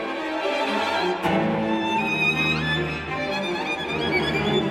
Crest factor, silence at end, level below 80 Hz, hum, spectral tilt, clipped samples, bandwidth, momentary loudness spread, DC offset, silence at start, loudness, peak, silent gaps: 14 dB; 0 s; -48 dBFS; none; -5 dB/octave; under 0.1%; 15.5 kHz; 6 LU; under 0.1%; 0 s; -23 LUFS; -10 dBFS; none